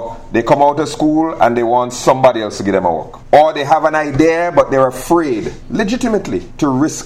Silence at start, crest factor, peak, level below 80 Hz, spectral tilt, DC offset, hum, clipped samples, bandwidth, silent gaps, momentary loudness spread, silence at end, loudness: 0 s; 14 dB; 0 dBFS; -36 dBFS; -5.5 dB/octave; under 0.1%; none; under 0.1%; 15 kHz; none; 8 LU; 0 s; -14 LUFS